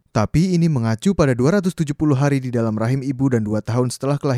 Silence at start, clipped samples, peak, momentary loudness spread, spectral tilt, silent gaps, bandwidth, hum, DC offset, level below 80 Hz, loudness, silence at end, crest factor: 0.15 s; under 0.1%; -2 dBFS; 5 LU; -7 dB/octave; none; 13.5 kHz; none; under 0.1%; -44 dBFS; -19 LUFS; 0 s; 16 dB